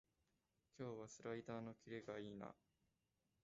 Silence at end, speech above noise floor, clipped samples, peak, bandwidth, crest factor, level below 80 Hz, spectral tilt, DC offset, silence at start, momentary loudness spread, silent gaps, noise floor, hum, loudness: 0.9 s; 35 dB; under 0.1%; -36 dBFS; 7.6 kHz; 20 dB; -84 dBFS; -6 dB/octave; under 0.1%; 0.75 s; 5 LU; none; -88 dBFS; none; -54 LUFS